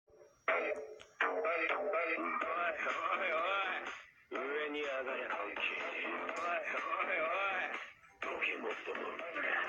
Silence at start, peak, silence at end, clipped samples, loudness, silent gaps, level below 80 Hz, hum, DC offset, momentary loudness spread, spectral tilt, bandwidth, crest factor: 0.15 s; -20 dBFS; 0 s; under 0.1%; -37 LUFS; none; -80 dBFS; none; under 0.1%; 8 LU; -2.5 dB/octave; 9.4 kHz; 18 dB